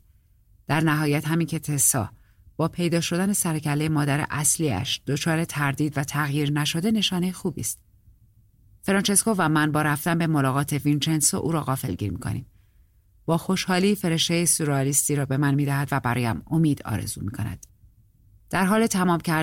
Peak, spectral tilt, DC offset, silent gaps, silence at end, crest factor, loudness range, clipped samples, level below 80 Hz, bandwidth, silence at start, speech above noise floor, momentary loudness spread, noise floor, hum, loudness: -6 dBFS; -4.5 dB/octave; under 0.1%; none; 0 s; 18 dB; 3 LU; under 0.1%; -52 dBFS; 16.5 kHz; 0.7 s; 35 dB; 9 LU; -58 dBFS; none; -23 LUFS